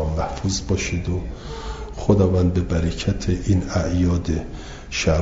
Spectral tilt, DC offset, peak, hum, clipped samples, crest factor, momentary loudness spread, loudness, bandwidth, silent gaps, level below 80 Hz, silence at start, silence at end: -6 dB/octave; under 0.1%; -2 dBFS; none; under 0.1%; 18 dB; 14 LU; -22 LUFS; 7.8 kHz; none; -32 dBFS; 0 s; 0 s